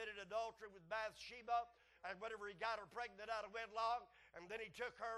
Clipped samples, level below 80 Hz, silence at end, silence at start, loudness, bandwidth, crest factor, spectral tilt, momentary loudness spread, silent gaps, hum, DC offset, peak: under 0.1%; -78 dBFS; 0 s; 0 s; -48 LUFS; 12 kHz; 18 dB; -2.5 dB/octave; 11 LU; none; none; under 0.1%; -30 dBFS